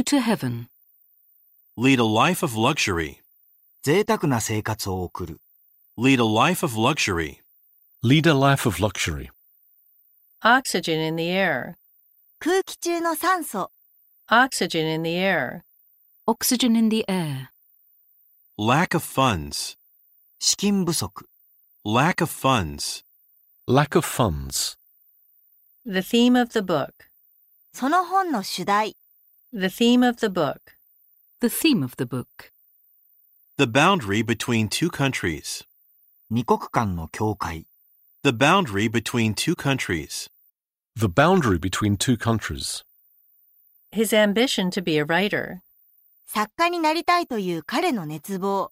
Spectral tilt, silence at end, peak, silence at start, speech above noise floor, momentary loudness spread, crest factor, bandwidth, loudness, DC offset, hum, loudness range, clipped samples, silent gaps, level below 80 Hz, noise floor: -4.5 dB/octave; 0.05 s; -2 dBFS; 0 s; 48 dB; 14 LU; 20 dB; 16 kHz; -22 LUFS; under 0.1%; none; 3 LU; under 0.1%; none; -50 dBFS; -69 dBFS